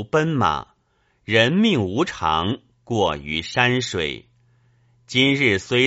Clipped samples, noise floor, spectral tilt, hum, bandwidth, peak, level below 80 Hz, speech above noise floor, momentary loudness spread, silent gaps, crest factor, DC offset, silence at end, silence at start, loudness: under 0.1%; -65 dBFS; -3.5 dB/octave; none; 8 kHz; -2 dBFS; -48 dBFS; 45 dB; 11 LU; none; 20 dB; under 0.1%; 0 s; 0 s; -20 LUFS